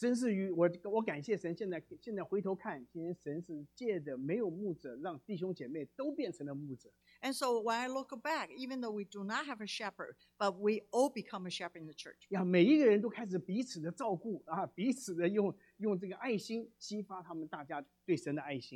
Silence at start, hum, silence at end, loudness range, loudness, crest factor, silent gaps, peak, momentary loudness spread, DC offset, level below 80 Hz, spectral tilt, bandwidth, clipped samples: 0 s; 60 Hz at -60 dBFS; 0 s; 7 LU; -37 LUFS; 20 dB; none; -16 dBFS; 11 LU; under 0.1%; -82 dBFS; -5.5 dB/octave; 14.5 kHz; under 0.1%